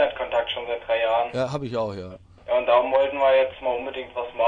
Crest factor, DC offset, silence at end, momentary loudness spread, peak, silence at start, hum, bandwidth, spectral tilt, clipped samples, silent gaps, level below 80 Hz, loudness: 18 dB; under 0.1%; 0 s; 12 LU; -6 dBFS; 0 s; none; 7.8 kHz; -5.5 dB/octave; under 0.1%; none; -56 dBFS; -23 LUFS